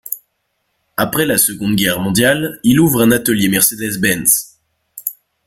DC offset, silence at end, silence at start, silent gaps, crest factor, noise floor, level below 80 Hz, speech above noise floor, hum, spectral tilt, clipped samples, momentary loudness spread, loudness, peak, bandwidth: under 0.1%; 0.35 s; 0.1 s; none; 16 dB; -68 dBFS; -46 dBFS; 54 dB; none; -3.5 dB/octave; under 0.1%; 14 LU; -13 LUFS; 0 dBFS; 17 kHz